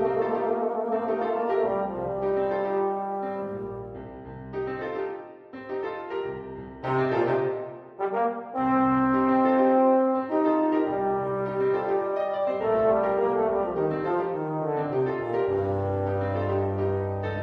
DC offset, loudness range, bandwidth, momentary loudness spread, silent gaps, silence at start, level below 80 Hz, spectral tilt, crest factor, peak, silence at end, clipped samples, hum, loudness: under 0.1%; 9 LU; 5.4 kHz; 13 LU; none; 0 s; -56 dBFS; -9.5 dB/octave; 14 dB; -10 dBFS; 0 s; under 0.1%; none; -26 LUFS